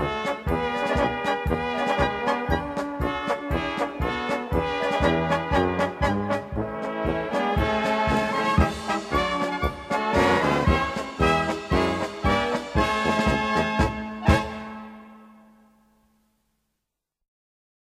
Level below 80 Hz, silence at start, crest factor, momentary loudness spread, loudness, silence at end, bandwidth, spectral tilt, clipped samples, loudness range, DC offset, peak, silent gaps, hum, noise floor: -36 dBFS; 0 s; 20 dB; 6 LU; -24 LUFS; 2.6 s; 14.5 kHz; -6 dB/octave; under 0.1%; 3 LU; under 0.1%; -4 dBFS; none; none; -82 dBFS